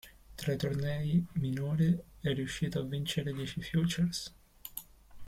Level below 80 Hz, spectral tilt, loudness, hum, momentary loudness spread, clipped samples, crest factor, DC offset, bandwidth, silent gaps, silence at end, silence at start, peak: -56 dBFS; -6 dB/octave; -34 LUFS; none; 14 LU; under 0.1%; 14 dB; under 0.1%; 16 kHz; none; 0 s; 0.05 s; -18 dBFS